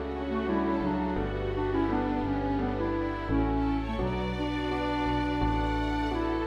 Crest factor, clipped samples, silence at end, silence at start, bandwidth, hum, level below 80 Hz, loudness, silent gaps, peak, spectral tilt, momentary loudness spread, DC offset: 14 dB; under 0.1%; 0 s; 0 s; 9.2 kHz; none; -38 dBFS; -30 LUFS; none; -16 dBFS; -8 dB/octave; 3 LU; under 0.1%